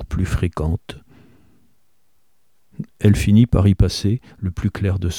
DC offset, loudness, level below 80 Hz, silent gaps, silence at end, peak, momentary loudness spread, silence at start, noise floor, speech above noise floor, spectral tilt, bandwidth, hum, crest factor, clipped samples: 0.2%; -19 LUFS; -30 dBFS; none; 0 s; -2 dBFS; 19 LU; 0 s; -68 dBFS; 51 dB; -7 dB/octave; 14 kHz; none; 18 dB; under 0.1%